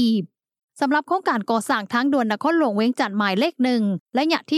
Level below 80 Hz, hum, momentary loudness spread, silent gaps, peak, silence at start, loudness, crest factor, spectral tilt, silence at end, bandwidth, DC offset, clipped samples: -82 dBFS; none; 3 LU; 0.63-0.68 s, 4.00-4.06 s; -6 dBFS; 0 s; -21 LUFS; 16 dB; -5.5 dB/octave; 0 s; 13.5 kHz; under 0.1%; under 0.1%